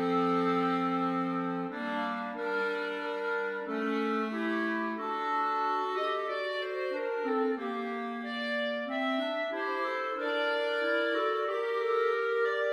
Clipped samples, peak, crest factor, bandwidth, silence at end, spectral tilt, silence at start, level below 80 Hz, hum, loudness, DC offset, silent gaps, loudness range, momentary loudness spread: under 0.1%; -18 dBFS; 14 dB; 10.5 kHz; 0 s; -6 dB/octave; 0 s; -84 dBFS; none; -31 LUFS; under 0.1%; none; 2 LU; 5 LU